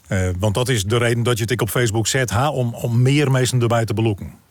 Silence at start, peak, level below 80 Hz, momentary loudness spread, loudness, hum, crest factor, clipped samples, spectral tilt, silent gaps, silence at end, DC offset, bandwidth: 0.1 s; -8 dBFS; -48 dBFS; 5 LU; -19 LUFS; none; 10 dB; under 0.1%; -5 dB/octave; none; 0.15 s; under 0.1%; 19 kHz